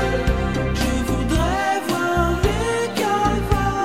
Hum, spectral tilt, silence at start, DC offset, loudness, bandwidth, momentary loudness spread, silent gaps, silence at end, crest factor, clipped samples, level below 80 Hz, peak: none; -5.5 dB/octave; 0 s; 0.5%; -21 LUFS; 16 kHz; 2 LU; none; 0 s; 16 dB; under 0.1%; -26 dBFS; -4 dBFS